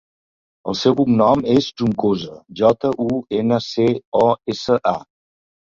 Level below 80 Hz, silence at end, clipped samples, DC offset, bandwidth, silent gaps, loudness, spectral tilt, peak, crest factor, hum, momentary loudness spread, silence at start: -52 dBFS; 0.8 s; under 0.1%; under 0.1%; 7.4 kHz; 4.05-4.12 s; -18 LUFS; -7 dB/octave; -2 dBFS; 16 dB; none; 8 LU; 0.65 s